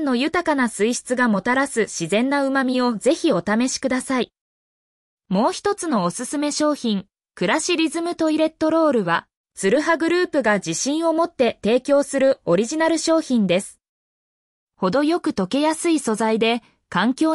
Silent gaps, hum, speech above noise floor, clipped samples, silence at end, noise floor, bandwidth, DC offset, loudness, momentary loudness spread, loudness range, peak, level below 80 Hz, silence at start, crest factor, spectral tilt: 4.41-5.18 s, 9.37-9.44 s, 13.89-14.67 s; none; over 70 dB; under 0.1%; 0 s; under -90 dBFS; 12 kHz; under 0.1%; -20 LUFS; 5 LU; 3 LU; -6 dBFS; -60 dBFS; 0 s; 14 dB; -4 dB/octave